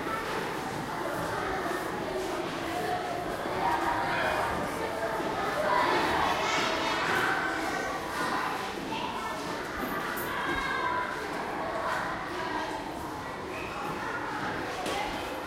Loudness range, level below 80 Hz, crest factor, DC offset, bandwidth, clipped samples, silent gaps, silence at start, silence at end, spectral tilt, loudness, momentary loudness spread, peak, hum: 6 LU; -54 dBFS; 18 dB; under 0.1%; 16 kHz; under 0.1%; none; 0 s; 0 s; -4 dB/octave; -31 LUFS; 7 LU; -14 dBFS; none